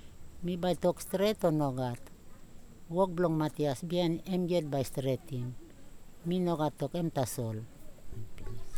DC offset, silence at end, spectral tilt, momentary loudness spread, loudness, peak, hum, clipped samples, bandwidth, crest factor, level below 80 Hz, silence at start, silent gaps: under 0.1%; 0 s; -6.5 dB/octave; 17 LU; -33 LUFS; -16 dBFS; none; under 0.1%; 19 kHz; 18 dB; -52 dBFS; 0 s; none